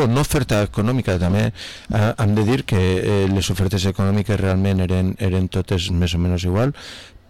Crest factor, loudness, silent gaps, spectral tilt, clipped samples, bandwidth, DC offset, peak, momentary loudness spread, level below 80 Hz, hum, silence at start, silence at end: 8 dB; -19 LUFS; none; -6.5 dB/octave; under 0.1%; 14.5 kHz; 0.6%; -12 dBFS; 3 LU; -36 dBFS; none; 0 s; 0 s